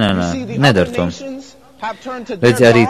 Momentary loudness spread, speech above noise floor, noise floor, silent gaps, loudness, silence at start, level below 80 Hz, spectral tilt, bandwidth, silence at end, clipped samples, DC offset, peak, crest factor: 17 LU; 20 dB; -34 dBFS; none; -15 LUFS; 0 s; -42 dBFS; -6 dB/octave; 14 kHz; 0 s; under 0.1%; 0.3%; 0 dBFS; 14 dB